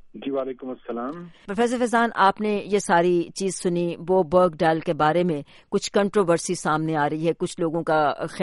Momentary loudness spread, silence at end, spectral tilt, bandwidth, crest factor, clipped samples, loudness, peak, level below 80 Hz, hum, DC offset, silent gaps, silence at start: 11 LU; 0 s; -5.5 dB/octave; 11.5 kHz; 16 dB; under 0.1%; -23 LUFS; -6 dBFS; -56 dBFS; none; under 0.1%; none; 0.05 s